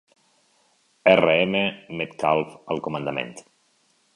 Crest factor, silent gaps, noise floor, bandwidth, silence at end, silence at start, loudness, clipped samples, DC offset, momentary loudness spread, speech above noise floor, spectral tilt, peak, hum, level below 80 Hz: 24 dB; none; -65 dBFS; 11.5 kHz; 0.75 s; 1.05 s; -22 LUFS; under 0.1%; under 0.1%; 14 LU; 42 dB; -5.5 dB/octave; 0 dBFS; none; -60 dBFS